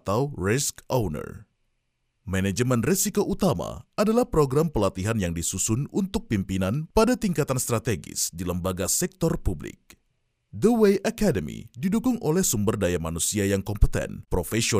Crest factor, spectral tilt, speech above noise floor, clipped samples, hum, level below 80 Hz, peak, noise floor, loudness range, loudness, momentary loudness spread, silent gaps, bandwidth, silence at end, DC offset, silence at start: 20 dB; -5 dB/octave; 49 dB; under 0.1%; none; -38 dBFS; -6 dBFS; -74 dBFS; 3 LU; -25 LUFS; 8 LU; none; 16 kHz; 0 s; under 0.1%; 0.05 s